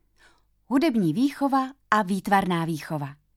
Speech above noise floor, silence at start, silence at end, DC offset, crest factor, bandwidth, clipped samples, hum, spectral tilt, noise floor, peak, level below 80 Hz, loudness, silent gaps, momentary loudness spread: 36 dB; 0.7 s; 0.25 s; under 0.1%; 20 dB; 15.5 kHz; under 0.1%; none; -6.5 dB/octave; -60 dBFS; -4 dBFS; -60 dBFS; -24 LUFS; none; 8 LU